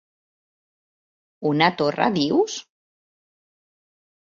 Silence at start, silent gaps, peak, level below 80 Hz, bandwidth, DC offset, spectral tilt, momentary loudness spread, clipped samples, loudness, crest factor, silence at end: 1.4 s; none; -4 dBFS; -66 dBFS; 7.6 kHz; under 0.1%; -5 dB/octave; 8 LU; under 0.1%; -21 LUFS; 22 dB; 1.7 s